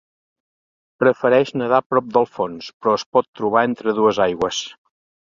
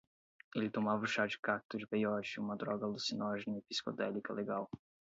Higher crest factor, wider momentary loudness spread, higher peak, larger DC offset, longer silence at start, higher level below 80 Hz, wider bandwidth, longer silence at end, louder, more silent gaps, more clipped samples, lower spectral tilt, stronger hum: about the same, 18 dB vs 20 dB; about the same, 7 LU vs 6 LU; first, -2 dBFS vs -20 dBFS; neither; first, 1 s vs 0.55 s; first, -58 dBFS vs -78 dBFS; about the same, 7.6 kHz vs 7.6 kHz; first, 0.5 s vs 0.35 s; first, -19 LUFS vs -38 LUFS; first, 1.86-1.90 s, 2.74-2.80 s, 3.06-3.12 s, 3.28-3.33 s vs 1.39-1.43 s, 1.65-1.69 s; neither; first, -5 dB/octave vs -3.5 dB/octave; neither